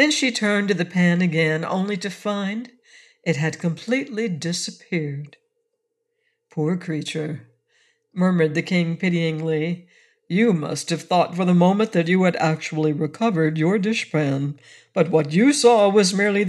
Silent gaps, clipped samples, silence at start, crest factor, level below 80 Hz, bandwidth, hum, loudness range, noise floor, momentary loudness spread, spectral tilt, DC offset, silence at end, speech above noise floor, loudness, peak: none; under 0.1%; 0 s; 18 dB; -74 dBFS; 12 kHz; none; 8 LU; -76 dBFS; 11 LU; -5.5 dB/octave; under 0.1%; 0 s; 55 dB; -21 LUFS; -4 dBFS